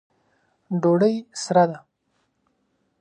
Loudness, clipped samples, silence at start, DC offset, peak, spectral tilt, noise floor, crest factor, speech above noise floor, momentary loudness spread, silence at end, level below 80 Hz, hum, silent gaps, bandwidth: -21 LUFS; under 0.1%; 0.7 s; under 0.1%; -6 dBFS; -6.5 dB/octave; -71 dBFS; 18 dB; 51 dB; 11 LU; 1.25 s; -74 dBFS; none; none; 11 kHz